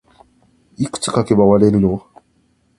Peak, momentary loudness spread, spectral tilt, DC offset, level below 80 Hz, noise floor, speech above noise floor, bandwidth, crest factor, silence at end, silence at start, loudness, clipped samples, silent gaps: 0 dBFS; 13 LU; -6.5 dB/octave; under 0.1%; -44 dBFS; -60 dBFS; 46 dB; 11.5 kHz; 18 dB; 0.8 s; 0.8 s; -15 LUFS; under 0.1%; none